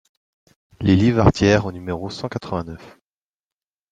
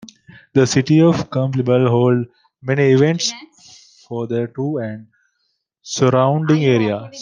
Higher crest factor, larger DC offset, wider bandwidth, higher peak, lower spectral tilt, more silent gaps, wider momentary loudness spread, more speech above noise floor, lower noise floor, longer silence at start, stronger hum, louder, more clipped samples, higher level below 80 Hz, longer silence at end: about the same, 20 dB vs 16 dB; neither; about the same, 9.2 kHz vs 9.8 kHz; about the same, -2 dBFS vs -2 dBFS; about the same, -7 dB/octave vs -6 dB/octave; neither; about the same, 13 LU vs 15 LU; first, over 71 dB vs 54 dB; first, under -90 dBFS vs -70 dBFS; first, 0.8 s vs 0.55 s; neither; about the same, -19 LUFS vs -17 LUFS; neither; first, -40 dBFS vs -58 dBFS; first, 1.05 s vs 0 s